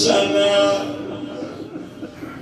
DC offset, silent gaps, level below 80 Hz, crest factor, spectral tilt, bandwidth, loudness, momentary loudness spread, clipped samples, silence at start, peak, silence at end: under 0.1%; none; -58 dBFS; 18 dB; -3.5 dB/octave; 13 kHz; -19 LUFS; 18 LU; under 0.1%; 0 s; -2 dBFS; 0 s